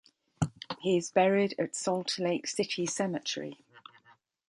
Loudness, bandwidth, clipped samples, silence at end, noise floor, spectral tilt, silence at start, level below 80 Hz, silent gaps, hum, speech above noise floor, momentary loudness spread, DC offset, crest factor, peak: -31 LUFS; 11.5 kHz; under 0.1%; 0.7 s; -64 dBFS; -4.5 dB/octave; 0.4 s; -64 dBFS; none; none; 34 dB; 10 LU; under 0.1%; 20 dB; -10 dBFS